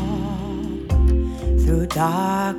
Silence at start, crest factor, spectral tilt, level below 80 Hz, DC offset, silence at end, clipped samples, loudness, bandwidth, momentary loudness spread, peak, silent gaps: 0 s; 14 dB; -7 dB/octave; -22 dBFS; under 0.1%; 0 s; under 0.1%; -21 LUFS; 14 kHz; 8 LU; -6 dBFS; none